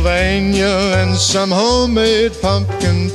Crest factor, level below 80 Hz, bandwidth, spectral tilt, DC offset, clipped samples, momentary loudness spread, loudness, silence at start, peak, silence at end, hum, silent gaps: 14 dB; -26 dBFS; 12.5 kHz; -4.5 dB/octave; under 0.1%; under 0.1%; 3 LU; -14 LUFS; 0 s; 0 dBFS; 0 s; none; none